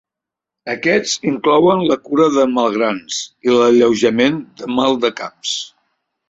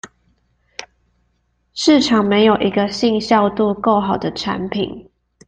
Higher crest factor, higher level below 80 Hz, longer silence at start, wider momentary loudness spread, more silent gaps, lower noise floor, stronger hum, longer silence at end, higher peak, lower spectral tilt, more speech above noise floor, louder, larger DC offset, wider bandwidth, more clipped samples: about the same, 14 dB vs 16 dB; second, -58 dBFS vs -50 dBFS; first, 0.65 s vs 0.05 s; second, 12 LU vs 21 LU; neither; first, -85 dBFS vs -65 dBFS; neither; first, 0.65 s vs 0.45 s; about the same, -2 dBFS vs -2 dBFS; about the same, -4 dB/octave vs -5 dB/octave; first, 70 dB vs 49 dB; about the same, -16 LUFS vs -16 LUFS; neither; second, 8 kHz vs 9.2 kHz; neither